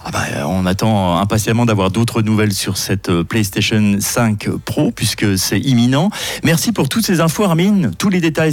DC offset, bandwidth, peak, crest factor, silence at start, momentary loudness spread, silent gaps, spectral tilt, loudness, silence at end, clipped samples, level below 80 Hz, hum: under 0.1%; 17 kHz; -4 dBFS; 12 dB; 0 s; 4 LU; none; -5 dB/octave; -15 LUFS; 0 s; under 0.1%; -44 dBFS; none